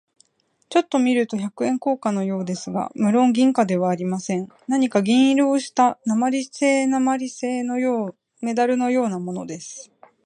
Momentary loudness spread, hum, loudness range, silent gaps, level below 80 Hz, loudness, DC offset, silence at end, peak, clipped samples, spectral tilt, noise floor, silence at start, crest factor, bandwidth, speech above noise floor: 10 LU; none; 3 LU; none; -72 dBFS; -21 LUFS; under 0.1%; 0.4 s; -4 dBFS; under 0.1%; -5.5 dB/octave; -67 dBFS; 0.7 s; 16 dB; 10 kHz; 47 dB